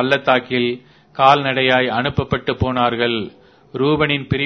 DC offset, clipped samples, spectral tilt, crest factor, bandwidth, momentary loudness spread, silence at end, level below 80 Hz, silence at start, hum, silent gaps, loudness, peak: under 0.1%; under 0.1%; -7 dB/octave; 18 dB; 6.4 kHz; 12 LU; 0 s; -42 dBFS; 0 s; none; none; -17 LUFS; 0 dBFS